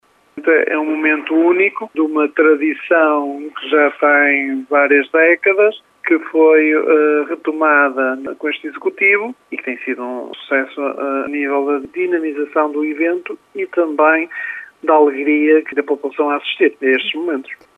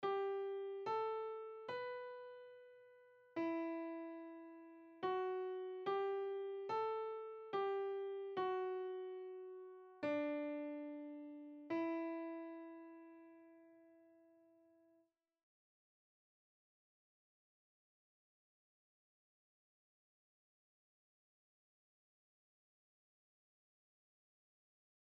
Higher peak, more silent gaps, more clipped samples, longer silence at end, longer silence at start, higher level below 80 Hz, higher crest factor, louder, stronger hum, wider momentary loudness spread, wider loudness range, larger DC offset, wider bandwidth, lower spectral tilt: first, -2 dBFS vs -28 dBFS; neither; neither; second, 0.25 s vs 10.8 s; first, 0.35 s vs 0 s; first, -70 dBFS vs under -90 dBFS; about the same, 14 dB vs 18 dB; first, -15 LUFS vs -45 LUFS; neither; second, 11 LU vs 17 LU; about the same, 6 LU vs 6 LU; neither; second, 3.9 kHz vs 6.4 kHz; first, -5 dB/octave vs -3 dB/octave